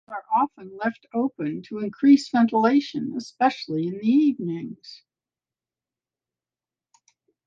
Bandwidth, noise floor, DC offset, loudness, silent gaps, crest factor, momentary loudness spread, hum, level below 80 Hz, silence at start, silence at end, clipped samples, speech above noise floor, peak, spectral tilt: 7.6 kHz; under -90 dBFS; under 0.1%; -23 LUFS; none; 18 dB; 13 LU; none; -74 dBFS; 0.1 s; 2.5 s; under 0.1%; over 67 dB; -6 dBFS; -6.5 dB/octave